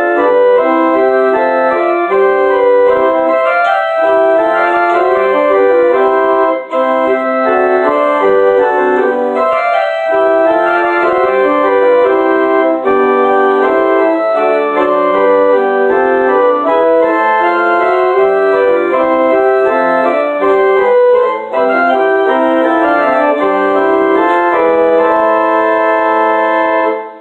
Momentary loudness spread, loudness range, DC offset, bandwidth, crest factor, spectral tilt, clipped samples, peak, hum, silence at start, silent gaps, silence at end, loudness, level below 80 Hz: 3 LU; 1 LU; under 0.1%; 7.8 kHz; 8 dB; -6 dB/octave; under 0.1%; -2 dBFS; none; 0 s; none; 0 s; -10 LUFS; -54 dBFS